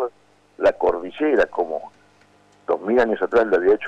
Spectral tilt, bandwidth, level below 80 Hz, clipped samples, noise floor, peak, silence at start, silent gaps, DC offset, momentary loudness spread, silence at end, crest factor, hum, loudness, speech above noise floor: -6 dB/octave; 8.2 kHz; -52 dBFS; under 0.1%; -55 dBFS; -8 dBFS; 0 s; none; under 0.1%; 10 LU; 0 s; 12 dB; 50 Hz at -60 dBFS; -21 LUFS; 36 dB